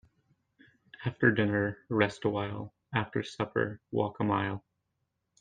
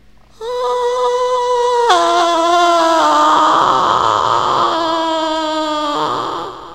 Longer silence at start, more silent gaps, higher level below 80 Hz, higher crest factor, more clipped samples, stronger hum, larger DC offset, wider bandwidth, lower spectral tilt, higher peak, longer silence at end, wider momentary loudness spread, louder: first, 1 s vs 0.4 s; neither; second, -66 dBFS vs -50 dBFS; first, 24 dB vs 14 dB; neither; neither; second, under 0.1% vs 0.4%; second, 9.2 kHz vs 16 kHz; first, -7 dB/octave vs -3 dB/octave; second, -8 dBFS vs 0 dBFS; first, 0.8 s vs 0 s; first, 11 LU vs 8 LU; second, -31 LUFS vs -13 LUFS